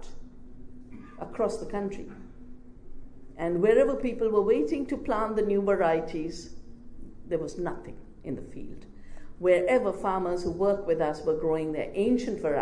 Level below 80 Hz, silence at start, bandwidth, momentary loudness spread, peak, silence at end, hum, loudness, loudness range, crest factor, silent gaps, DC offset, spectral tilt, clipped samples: -46 dBFS; 0 s; 10 kHz; 20 LU; -10 dBFS; 0 s; none; -28 LUFS; 11 LU; 18 dB; none; under 0.1%; -6.5 dB/octave; under 0.1%